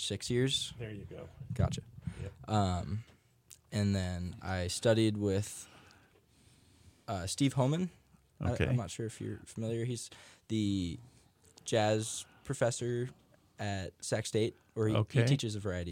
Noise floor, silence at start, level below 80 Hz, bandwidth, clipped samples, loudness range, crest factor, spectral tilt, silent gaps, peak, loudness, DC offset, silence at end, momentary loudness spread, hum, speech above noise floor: -65 dBFS; 0 s; -56 dBFS; 16 kHz; under 0.1%; 3 LU; 20 dB; -5.5 dB/octave; none; -16 dBFS; -34 LUFS; under 0.1%; 0 s; 14 LU; none; 32 dB